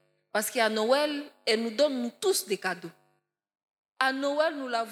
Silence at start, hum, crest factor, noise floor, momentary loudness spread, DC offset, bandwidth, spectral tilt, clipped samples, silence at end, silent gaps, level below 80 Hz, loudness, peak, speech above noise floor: 0.35 s; none; 22 dB; -74 dBFS; 7 LU; under 0.1%; 16.5 kHz; -2.5 dB/octave; under 0.1%; 0 s; 3.73-3.83 s; under -90 dBFS; -28 LUFS; -8 dBFS; 46 dB